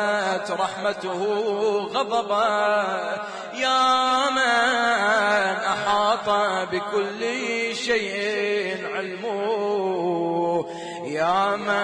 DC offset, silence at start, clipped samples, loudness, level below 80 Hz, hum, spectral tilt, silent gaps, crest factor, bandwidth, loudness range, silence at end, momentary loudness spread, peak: under 0.1%; 0 s; under 0.1%; -23 LUFS; -66 dBFS; none; -3.5 dB/octave; none; 14 dB; 10.5 kHz; 4 LU; 0 s; 8 LU; -8 dBFS